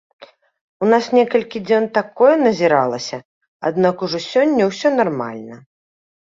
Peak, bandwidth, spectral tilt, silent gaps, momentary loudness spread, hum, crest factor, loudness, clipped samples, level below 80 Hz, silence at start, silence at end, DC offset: -2 dBFS; 7.6 kHz; -5.5 dB/octave; 0.61-0.80 s, 3.25-3.41 s, 3.48-3.60 s; 12 LU; none; 16 dB; -17 LUFS; under 0.1%; -62 dBFS; 0.2 s; 0.7 s; under 0.1%